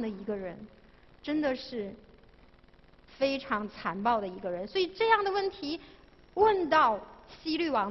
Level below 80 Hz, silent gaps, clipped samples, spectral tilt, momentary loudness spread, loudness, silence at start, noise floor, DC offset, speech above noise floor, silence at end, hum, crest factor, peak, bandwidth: -60 dBFS; none; under 0.1%; -6 dB/octave; 16 LU; -30 LUFS; 0 s; -58 dBFS; under 0.1%; 28 dB; 0 s; none; 20 dB; -10 dBFS; 6.2 kHz